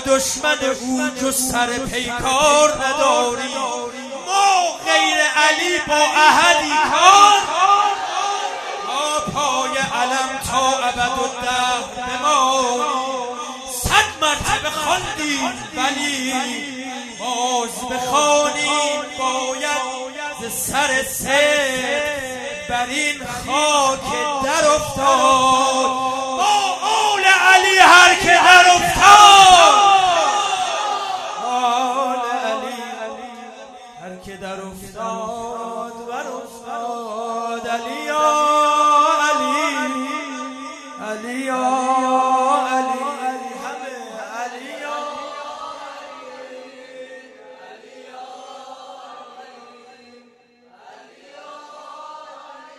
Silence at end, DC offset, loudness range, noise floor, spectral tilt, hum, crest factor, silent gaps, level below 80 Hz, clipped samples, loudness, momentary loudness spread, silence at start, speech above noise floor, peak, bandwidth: 0.15 s; under 0.1%; 18 LU; -52 dBFS; -1 dB/octave; none; 18 dB; none; -48 dBFS; under 0.1%; -16 LUFS; 20 LU; 0 s; 36 dB; 0 dBFS; 14 kHz